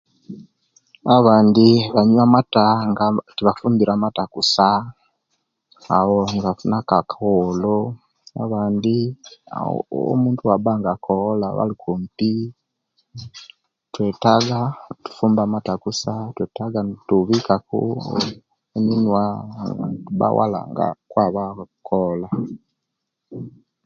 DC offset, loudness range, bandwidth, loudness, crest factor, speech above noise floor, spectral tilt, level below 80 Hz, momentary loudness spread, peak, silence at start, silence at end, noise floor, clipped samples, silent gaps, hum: under 0.1%; 7 LU; 7.6 kHz; -19 LUFS; 20 dB; 60 dB; -6.5 dB/octave; -54 dBFS; 19 LU; 0 dBFS; 0.3 s; 0.35 s; -79 dBFS; under 0.1%; none; none